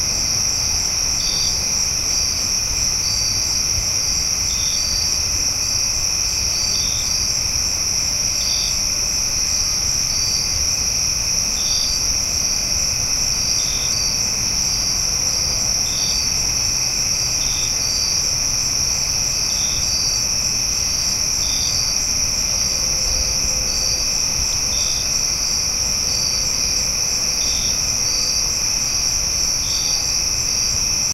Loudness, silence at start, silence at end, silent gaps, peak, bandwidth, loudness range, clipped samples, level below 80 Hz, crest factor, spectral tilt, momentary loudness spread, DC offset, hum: -16 LUFS; 0 s; 0 s; none; -4 dBFS; 16 kHz; 0 LU; under 0.1%; -34 dBFS; 14 dB; 0 dB/octave; 1 LU; under 0.1%; none